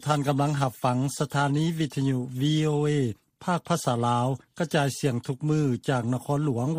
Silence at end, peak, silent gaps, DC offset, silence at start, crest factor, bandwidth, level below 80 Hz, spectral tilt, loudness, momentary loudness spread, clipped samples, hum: 0 s; -8 dBFS; none; under 0.1%; 0 s; 16 dB; 15.5 kHz; -62 dBFS; -6 dB/octave; -26 LUFS; 5 LU; under 0.1%; none